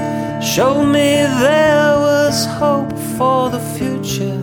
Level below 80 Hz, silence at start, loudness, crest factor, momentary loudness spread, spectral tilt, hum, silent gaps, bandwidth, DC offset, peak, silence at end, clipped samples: -44 dBFS; 0 s; -14 LUFS; 12 dB; 9 LU; -4.5 dB/octave; none; none; over 20 kHz; under 0.1%; -2 dBFS; 0 s; under 0.1%